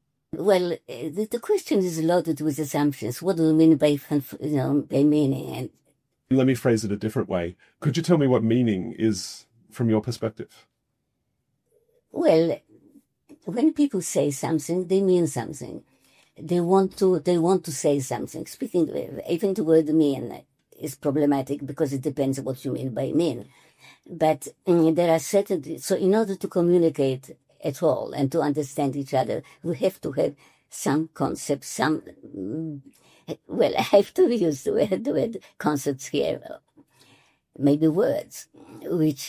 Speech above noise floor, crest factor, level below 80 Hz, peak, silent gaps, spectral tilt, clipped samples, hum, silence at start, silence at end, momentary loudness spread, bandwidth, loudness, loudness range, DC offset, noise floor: 53 dB; 18 dB; -60 dBFS; -6 dBFS; none; -6.5 dB/octave; under 0.1%; none; 0.35 s; 0 s; 14 LU; 16 kHz; -24 LUFS; 5 LU; under 0.1%; -77 dBFS